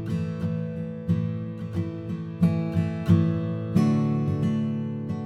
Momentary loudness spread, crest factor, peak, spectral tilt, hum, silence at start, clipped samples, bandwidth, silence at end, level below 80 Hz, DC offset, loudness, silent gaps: 10 LU; 18 dB; -8 dBFS; -9.5 dB/octave; none; 0 s; under 0.1%; 8 kHz; 0 s; -54 dBFS; under 0.1%; -26 LUFS; none